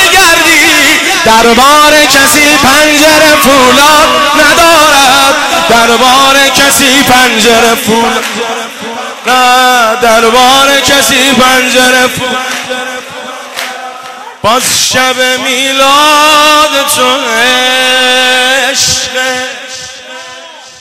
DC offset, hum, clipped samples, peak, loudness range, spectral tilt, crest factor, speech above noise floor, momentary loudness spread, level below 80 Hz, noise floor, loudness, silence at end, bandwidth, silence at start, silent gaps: 0.8%; none; 1%; 0 dBFS; 6 LU; -1 dB/octave; 6 dB; 22 dB; 15 LU; -36 dBFS; -28 dBFS; -4 LUFS; 0.1 s; over 20 kHz; 0 s; none